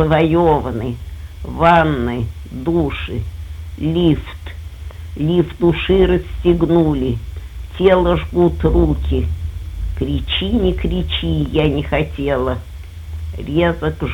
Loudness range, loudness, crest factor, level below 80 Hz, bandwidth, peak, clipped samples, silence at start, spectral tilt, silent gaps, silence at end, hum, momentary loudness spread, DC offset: 4 LU; -17 LUFS; 16 dB; -26 dBFS; 17.5 kHz; -2 dBFS; under 0.1%; 0 s; -8 dB/octave; none; 0 s; none; 18 LU; under 0.1%